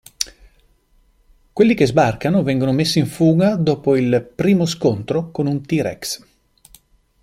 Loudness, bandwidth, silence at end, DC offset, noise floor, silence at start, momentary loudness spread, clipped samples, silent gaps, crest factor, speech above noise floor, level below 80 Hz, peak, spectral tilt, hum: -18 LUFS; 16 kHz; 1.05 s; under 0.1%; -57 dBFS; 0.2 s; 11 LU; under 0.1%; none; 18 dB; 40 dB; -50 dBFS; 0 dBFS; -6 dB/octave; none